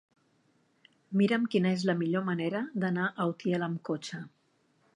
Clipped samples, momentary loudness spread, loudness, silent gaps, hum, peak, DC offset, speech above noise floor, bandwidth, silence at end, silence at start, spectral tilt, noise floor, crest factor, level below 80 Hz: under 0.1%; 9 LU; -30 LUFS; none; none; -14 dBFS; under 0.1%; 41 dB; 10 kHz; 0.7 s; 1.1 s; -7 dB/octave; -70 dBFS; 18 dB; -78 dBFS